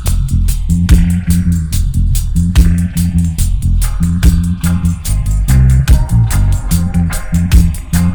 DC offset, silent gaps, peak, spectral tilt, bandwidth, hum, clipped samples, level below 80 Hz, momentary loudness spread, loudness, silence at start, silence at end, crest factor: under 0.1%; none; 0 dBFS; -6 dB/octave; over 20 kHz; none; 0.5%; -14 dBFS; 5 LU; -13 LUFS; 0 s; 0 s; 10 dB